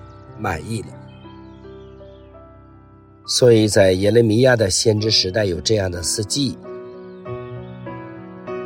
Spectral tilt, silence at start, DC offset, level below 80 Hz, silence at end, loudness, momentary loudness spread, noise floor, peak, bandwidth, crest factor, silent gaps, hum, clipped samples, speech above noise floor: -4.5 dB/octave; 0.05 s; under 0.1%; -46 dBFS; 0 s; -17 LUFS; 22 LU; -46 dBFS; -2 dBFS; 16.5 kHz; 18 dB; none; none; under 0.1%; 29 dB